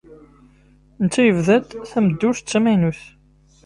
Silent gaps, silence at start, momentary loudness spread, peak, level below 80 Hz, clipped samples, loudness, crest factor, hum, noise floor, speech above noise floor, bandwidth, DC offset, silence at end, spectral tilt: none; 0.1 s; 8 LU; -4 dBFS; -52 dBFS; under 0.1%; -18 LUFS; 16 dB; 50 Hz at -45 dBFS; -53 dBFS; 36 dB; 11.5 kHz; under 0.1%; 0.65 s; -6 dB/octave